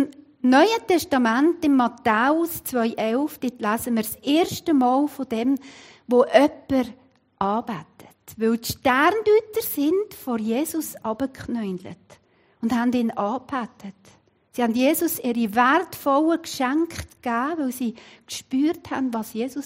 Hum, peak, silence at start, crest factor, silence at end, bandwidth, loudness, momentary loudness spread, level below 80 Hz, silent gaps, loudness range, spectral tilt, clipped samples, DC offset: none; -4 dBFS; 0 s; 20 dB; 0 s; 16 kHz; -22 LUFS; 11 LU; -60 dBFS; none; 5 LU; -4.5 dB/octave; under 0.1%; under 0.1%